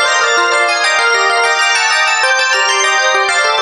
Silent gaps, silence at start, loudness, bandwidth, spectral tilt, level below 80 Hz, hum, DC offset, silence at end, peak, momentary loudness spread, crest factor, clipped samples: none; 0 s; -10 LUFS; 12 kHz; 2 dB/octave; -64 dBFS; none; under 0.1%; 0 s; 0 dBFS; 1 LU; 12 dB; under 0.1%